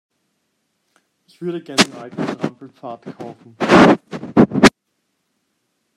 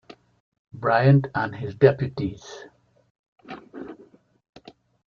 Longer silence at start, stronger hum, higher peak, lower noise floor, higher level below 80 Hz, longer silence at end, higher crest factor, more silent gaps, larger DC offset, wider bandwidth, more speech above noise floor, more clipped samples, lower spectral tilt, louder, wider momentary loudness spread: first, 1.4 s vs 0.75 s; neither; about the same, 0 dBFS vs -2 dBFS; first, -71 dBFS vs -54 dBFS; first, -48 dBFS vs -58 dBFS; about the same, 1.25 s vs 1.15 s; second, 18 dB vs 24 dB; second, none vs 3.10-3.36 s; neither; first, 14 kHz vs 6.8 kHz; first, 51 dB vs 32 dB; neither; second, -5 dB/octave vs -8.5 dB/octave; first, -16 LUFS vs -22 LUFS; about the same, 23 LU vs 24 LU